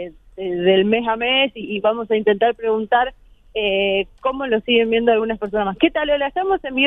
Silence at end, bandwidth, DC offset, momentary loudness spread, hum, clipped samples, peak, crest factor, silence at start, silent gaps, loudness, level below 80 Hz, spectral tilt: 0 s; 3.9 kHz; under 0.1%; 7 LU; none; under 0.1%; -2 dBFS; 18 dB; 0 s; none; -19 LUFS; -48 dBFS; -7.5 dB/octave